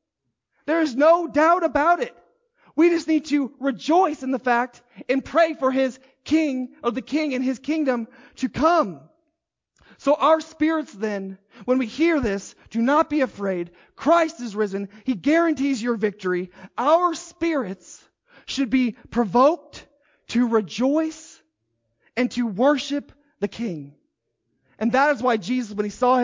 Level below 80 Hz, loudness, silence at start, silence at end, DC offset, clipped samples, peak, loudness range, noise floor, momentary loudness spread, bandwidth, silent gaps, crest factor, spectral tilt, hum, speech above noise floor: -56 dBFS; -22 LUFS; 0.65 s; 0 s; under 0.1%; under 0.1%; -6 dBFS; 4 LU; -79 dBFS; 12 LU; 7.6 kHz; none; 16 dB; -5 dB/octave; none; 58 dB